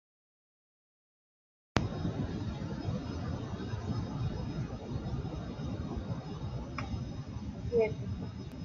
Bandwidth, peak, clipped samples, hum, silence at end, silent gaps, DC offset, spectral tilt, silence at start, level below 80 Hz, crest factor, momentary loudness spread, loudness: 7.4 kHz; -8 dBFS; under 0.1%; none; 0 s; none; under 0.1%; -7.5 dB/octave; 1.75 s; -48 dBFS; 30 dB; 7 LU; -37 LUFS